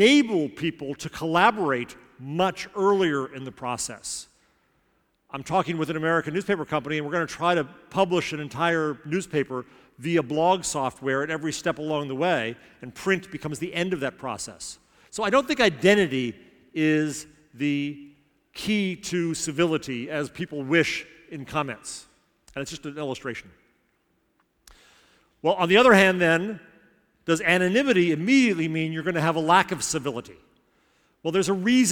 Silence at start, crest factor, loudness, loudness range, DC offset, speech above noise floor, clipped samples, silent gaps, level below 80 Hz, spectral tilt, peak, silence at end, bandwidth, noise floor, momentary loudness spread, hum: 0 s; 24 dB; -24 LUFS; 7 LU; under 0.1%; 45 dB; under 0.1%; none; -60 dBFS; -4.5 dB/octave; -2 dBFS; 0 s; 18.5 kHz; -69 dBFS; 15 LU; none